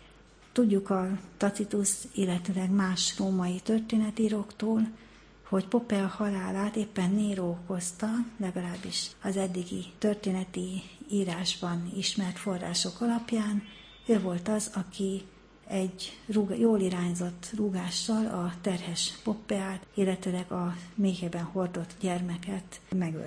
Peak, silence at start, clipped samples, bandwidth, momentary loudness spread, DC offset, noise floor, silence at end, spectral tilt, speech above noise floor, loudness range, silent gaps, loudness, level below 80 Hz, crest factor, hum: -14 dBFS; 0 s; under 0.1%; 10.5 kHz; 7 LU; under 0.1%; -56 dBFS; 0 s; -5 dB/octave; 25 dB; 3 LU; none; -31 LUFS; -60 dBFS; 18 dB; none